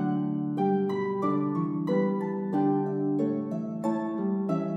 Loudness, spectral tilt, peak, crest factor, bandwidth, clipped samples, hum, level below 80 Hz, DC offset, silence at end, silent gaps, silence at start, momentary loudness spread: -28 LUFS; -9.5 dB/octave; -14 dBFS; 12 dB; 7.6 kHz; under 0.1%; none; -78 dBFS; under 0.1%; 0 s; none; 0 s; 4 LU